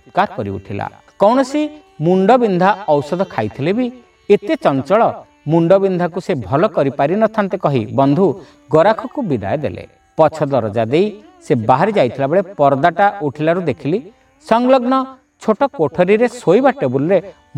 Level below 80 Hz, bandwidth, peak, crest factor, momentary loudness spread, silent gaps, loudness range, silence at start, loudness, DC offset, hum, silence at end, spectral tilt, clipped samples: -54 dBFS; 11 kHz; 0 dBFS; 16 dB; 9 LU; none; 2 LU; 0.15 s; -16 LUFS; under 0.1%; none; 0.25 s; -7.5 dB/octave; under 0.1%